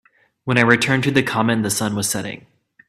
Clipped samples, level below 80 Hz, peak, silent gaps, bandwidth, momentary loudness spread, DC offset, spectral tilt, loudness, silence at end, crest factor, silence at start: under 0.1%; -56 dBFS; 0 dBFS; none; 15.5 kHz; 16 LU; under 0.1%; -4 dB/octave; -18 LUFS; 0.5 s; 20 dB; 0.45 s